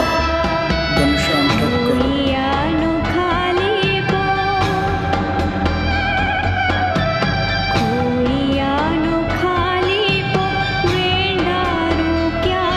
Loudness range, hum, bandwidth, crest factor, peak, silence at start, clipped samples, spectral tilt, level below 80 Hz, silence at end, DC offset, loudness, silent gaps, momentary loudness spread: 1 LU; none; 14 kHz; 14 dB; -2 dBFS; 0 s; under 0.1%; -6 dB/octave; -30 dBFS; 0 s; under 0.1%; -17 LUFS; none; 2 LU